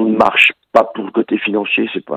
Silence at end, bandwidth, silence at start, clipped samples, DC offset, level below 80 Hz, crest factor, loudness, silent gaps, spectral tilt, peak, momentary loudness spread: 0 s; 14 kHz; 0 s; 0.2%; under 0.1%; -56 dBFS; 14 dB; -14 LUFS; none; -5 dB/octave; 0 dBFS; 8 LU